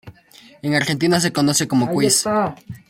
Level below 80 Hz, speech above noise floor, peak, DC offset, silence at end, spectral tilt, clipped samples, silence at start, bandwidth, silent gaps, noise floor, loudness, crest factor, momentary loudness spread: -56 dBFS; 29 dB; -2 dBFS; under 0.1%; 0.15 s; -4 dB/octave; under 0.1%; 0.05 s; 16.5 kHz; none; -48 dBFS; -18 LUFS; 16 dB; 5 LU